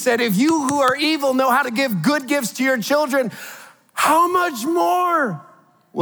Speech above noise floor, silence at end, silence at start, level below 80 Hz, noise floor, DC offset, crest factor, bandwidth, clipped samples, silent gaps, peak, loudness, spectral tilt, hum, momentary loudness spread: 23 dB; 0 s; 0 s; -76 dBFS; -41 dBFS; under 0.1%; 16 dB; over 20 kHz; under 0.1%; none; -4 dBFS; -18 LUFS; -4 dB/octave; none; 10 LU